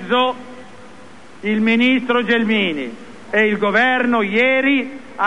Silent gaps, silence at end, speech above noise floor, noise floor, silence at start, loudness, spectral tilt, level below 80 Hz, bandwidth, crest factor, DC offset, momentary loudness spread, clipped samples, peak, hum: none; 0 s; 25 dB; -42 dBFS; 0 s; -16 LUFS; -5.5 dB/octave; -60 dBFS; 10.5 kHz; 16 dB; 1%; 15 LU; under 0.1%; -2 dBFS; none